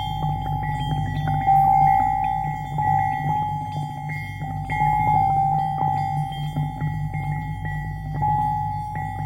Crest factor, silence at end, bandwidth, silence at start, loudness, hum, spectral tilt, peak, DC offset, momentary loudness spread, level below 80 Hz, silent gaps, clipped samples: 16 dB; 0 s; 15.5 kHz; 0 s; -23 LUFS; none; -7 dB/octave; -8 dBFS; under 0.1%; 11 LU; -38 dBFS; none; under 0.1%